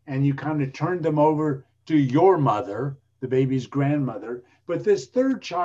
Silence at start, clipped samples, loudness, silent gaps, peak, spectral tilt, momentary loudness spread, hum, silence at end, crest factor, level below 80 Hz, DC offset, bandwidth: 0.05 s; under 0.1%; -23 LUFS; none; -6 dBFS; -8 dB/octave; 14 LU; none; 0 s; 18 dB; -62 dBFS; under 0.1%; 7.8 kHz